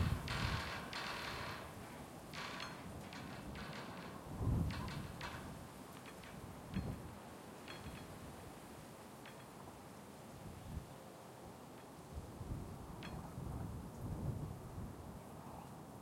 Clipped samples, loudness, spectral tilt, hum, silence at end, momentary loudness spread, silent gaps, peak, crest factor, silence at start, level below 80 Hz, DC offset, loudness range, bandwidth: under 0.1%; -48 LUFS; -5.5 dB/octave; none; 0 s; 14 LU; none; -26 dBFS; 22 dB; 0 s; -56 dBFS; under 0.1%; 8 LU; 16.5 kHz